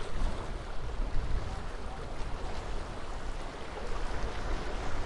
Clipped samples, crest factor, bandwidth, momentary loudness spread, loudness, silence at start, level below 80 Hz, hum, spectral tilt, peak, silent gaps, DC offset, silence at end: under 0.1%; 14 dB; 11 kHz; 4 LU; -40 LUFS; 0 s; -36 dBFS; none; -5.5 dB/octave; -18 dBFS; none; under 0.1%; 0 s